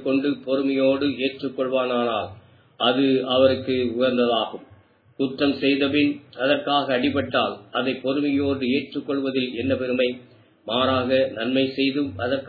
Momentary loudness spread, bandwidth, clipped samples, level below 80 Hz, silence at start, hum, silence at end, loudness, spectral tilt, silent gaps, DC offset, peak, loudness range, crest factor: 7 LU; 4.9 kHz; under 0.1%; -64 dBFS; 0 s; none; 0 s; -22 LUFS; -8.5 dB/octave; none; under 0.1%; -4 dBFS; 2 LU; 18 dB